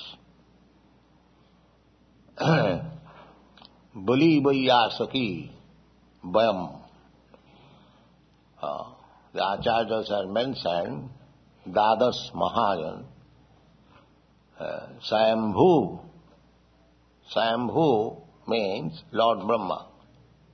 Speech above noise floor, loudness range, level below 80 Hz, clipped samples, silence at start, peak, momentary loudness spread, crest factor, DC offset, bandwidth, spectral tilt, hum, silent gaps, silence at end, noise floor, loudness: 36 dB; 7 LU; -60 dBFS; under 0.1%; 0 s; -6 dBFS; 19 LU; 22 dB; under 0.1%; 6.4 kHz; -6.5 dB/octave; none; none; 0.7 s; -60 dBFS; -25 LUFS